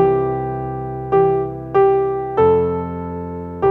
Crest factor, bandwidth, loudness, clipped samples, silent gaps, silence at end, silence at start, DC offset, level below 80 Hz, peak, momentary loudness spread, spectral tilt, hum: 14 dB; 3.8 kHz; -18 LUFS; under 0.1%; none; 0 s; 0 s; under 0.1%; -42 dBFS; -4 dBFS; 12 LU; -10.5 dB/octave; none